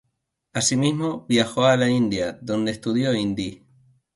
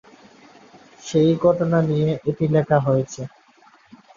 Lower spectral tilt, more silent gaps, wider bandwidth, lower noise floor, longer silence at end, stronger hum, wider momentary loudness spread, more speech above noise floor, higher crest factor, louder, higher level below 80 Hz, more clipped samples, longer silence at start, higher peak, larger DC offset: second, -4.5 dB/octave vs -7.5 dB/octave; neither; first, 11.5 kHz vs 7.4 kHz; first, -76 dBFS vs -53 dBFS; second, 0.6 s vs 0.9 s; neither; second, 8 LU vs 15 LU; first, 54 dB vs 35 dB; about the same, 20 dB vs 18 dB; about the same, -22 LUFS vs -20 LUFS; about the same, -56 dBFS vs -56 dBFS; neither; second, 0.55 s vs 1.05 s; about the same, -4 dBFS vs -4 dBFS; neither